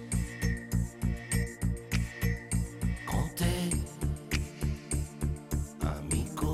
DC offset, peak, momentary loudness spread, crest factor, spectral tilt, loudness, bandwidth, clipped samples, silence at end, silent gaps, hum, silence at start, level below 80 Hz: under 0.1%; -16 dBFS; 5 LU; 16 dB; -5 dB/octave; -33 LUFS; 16 kHz; under 0.1%; 0 s; none; none; 0 s; -36 dBFS